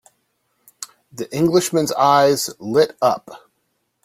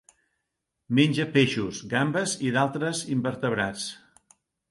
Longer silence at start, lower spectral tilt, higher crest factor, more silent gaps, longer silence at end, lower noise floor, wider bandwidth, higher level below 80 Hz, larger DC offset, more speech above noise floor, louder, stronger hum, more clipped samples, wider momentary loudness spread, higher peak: about the same, 0.8 s vs 0.9 s; about the same, -4.5 dB/octave vs -5 dB/octave; about the same, 18 dB vs 18 dB; neither; about the same, 0.7 s vs 0.75 s; second, -70 dBFS vs -82 dBFS; first, 16.5 kHz vs 11.5 kHz; about the same, -58 dBFS vs -62 dBFS; neither; second, 53 dB vs 57 dB; first, -17 LUFS vs -26 LUFS; neither; neither; first, 20 LU vs 7 LU; first, -2 dBFS vs -8 dBFS